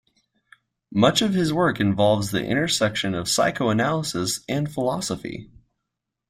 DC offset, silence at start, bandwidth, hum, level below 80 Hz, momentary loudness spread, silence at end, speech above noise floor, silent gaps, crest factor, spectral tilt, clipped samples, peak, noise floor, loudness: under 0.1%; 0.9 s; 16 kHz; none; -54 dBFS; 9 LU; 0.85 s; 60 dB; none; 20 dB; -4.5 dB/octave; under 0.1%; -4 dBFS; -82 dBFS; -22 LUFS